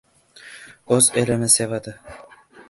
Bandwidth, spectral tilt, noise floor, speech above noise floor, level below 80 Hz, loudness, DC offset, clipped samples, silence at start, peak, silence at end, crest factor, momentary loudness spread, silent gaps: 12 kHz; -3.5 dB/octave; -46 dBFS; 26 dB; -56 dBFS; -18 LUFS; under 0.1%; under 0.1%; 0.45 s; -2 dBFS; 0.5 s; 22 dB; 23 LU; none